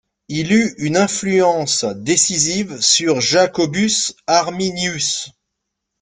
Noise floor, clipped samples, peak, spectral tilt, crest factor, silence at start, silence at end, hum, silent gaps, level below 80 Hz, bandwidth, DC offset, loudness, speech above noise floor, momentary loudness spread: -77 dBFS; under 0.1%; 0 dBFS; -3 dB/octave; 18 dB; 0.3 s; 0.7 s; none; none; -54 dBFS; 10.5 kHz; under 0.1%; -16 LUFS; 60 dB; 6 LU